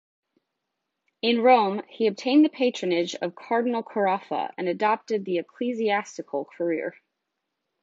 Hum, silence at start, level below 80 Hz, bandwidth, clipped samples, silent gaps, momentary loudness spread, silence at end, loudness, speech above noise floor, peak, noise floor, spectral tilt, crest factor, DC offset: none; 1.25 s; -80 dBFS; 7.8 kHz; under 0.1%; none; 11 LU; 0.9 s; -25 LUFS; 57 dB; -4 dBFS; -82 dBFS; -5 dB/octave; 20 dB; under 0.1%